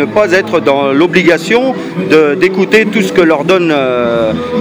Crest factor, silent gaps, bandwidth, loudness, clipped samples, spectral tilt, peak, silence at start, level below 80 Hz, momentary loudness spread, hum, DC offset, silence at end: 10 dB; none; over 20 kHz; -10 LUFS; 0.6%; -5.5 dB/octave; 0 dBFS; 0 s; -46 dBFS; 4 LU; none; under 0.1%; 0 s